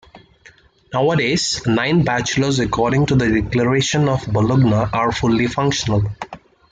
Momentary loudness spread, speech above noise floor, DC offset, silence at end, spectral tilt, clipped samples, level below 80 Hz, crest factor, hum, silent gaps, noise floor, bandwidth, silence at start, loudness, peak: 4 LU; 32 dB; under 0.1%; 0.35 s; -5.5 dB/octave; under 0.1%; -40 dBFS; 14 dB; none; none; -49 dBFS; 9.4 kHz; 0.15 s; -17 LUFS; -4 dBFS